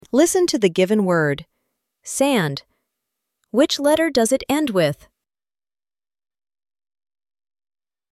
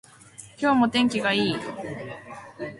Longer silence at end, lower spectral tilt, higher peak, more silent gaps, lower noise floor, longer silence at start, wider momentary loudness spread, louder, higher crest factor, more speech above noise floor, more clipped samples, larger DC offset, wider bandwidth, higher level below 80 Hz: first, 3.2 s vs 0 s; about the same, -4.5 dB/octave vs -4.5 dB/octave; first, -4 dBFS vs -8 dBFS; neither; first, under -90 dBFS vs -48 dBFS; second, 0.15 s vs 0.4 s; second, 12 LU vs 21 LU; first, -19 LUFS vs -24 LUFS; about the same, 18 dB vs 18 dB; first, over 72 dB vs 23 dB; neither; neither; first, 15.5 kHz vs 11.5 kHz; about the same, -58 dBFS vs -62 dBFS